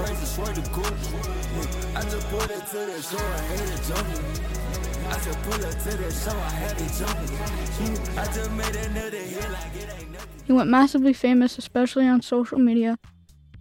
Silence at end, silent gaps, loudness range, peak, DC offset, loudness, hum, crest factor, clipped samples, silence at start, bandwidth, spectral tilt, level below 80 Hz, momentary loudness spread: 0 s; none; 8 LU; -6 dBFS; under 0.1%; -25 LUFS; none; 18 dB; under 0.1%; 0 s; 17 kHz; -5 dB/octave; -32 dBFS; 11 LU